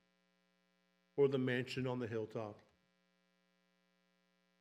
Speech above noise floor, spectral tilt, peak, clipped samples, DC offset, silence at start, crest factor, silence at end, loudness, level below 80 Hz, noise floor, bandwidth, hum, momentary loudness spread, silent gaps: 41 dB; -7 dB/octave; -22 dBFS; under 0.1%; under 0.1%; 1.15 s; 20 dB; 2.05 s; -39 LUFS; -84 dBFS; -79 dBFS; 11 kHz; 60 Hz at -70 dBFS; 13 LU; none